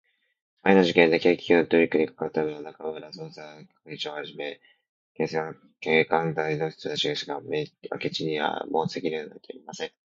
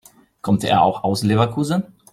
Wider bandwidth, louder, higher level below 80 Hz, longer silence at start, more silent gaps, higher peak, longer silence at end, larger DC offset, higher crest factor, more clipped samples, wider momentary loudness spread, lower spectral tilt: second, 7.6 kHz vs 14.5 kHz; second, -26 LUFS vs -19 LUFS; second, -68 dBFS vs -54 dBFS; first, 0.65 s vs 0.45 s; first, 4.89-5.15 s vs none; about the same, -2 dBFS vs -2 dBFS; about the same, 0.3 s vs 0.3 s; neither; first, 24 dB vs 16 dB; neither; first, 18 LU vs 7 LU; about the same, -5.5 dB/octave vs -6 dB/octave